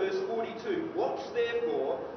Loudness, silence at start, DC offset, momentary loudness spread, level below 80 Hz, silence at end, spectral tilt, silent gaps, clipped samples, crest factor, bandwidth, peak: -32 LUFS; 0 s; under 0.1%; 4 LU; -70 dBFS; 0 s; -3 dB/octave; none; under 0.1%; 12 dB; 6.4 kHz; -20 dBFS